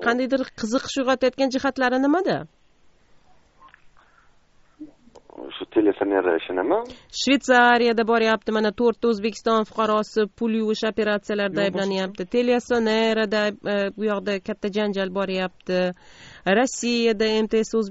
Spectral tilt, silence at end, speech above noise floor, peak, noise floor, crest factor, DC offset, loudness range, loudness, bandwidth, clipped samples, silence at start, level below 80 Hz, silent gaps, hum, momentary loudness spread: -3 dB/octave; 0 s; 35 dB; -4 dBFS; -57 dBFS; 20 dB; under 0.1%; 7 LU; -22 LUFS; 8 kHz; under 0.1%; 0 s; -58 dBFS; none; none; 6 LU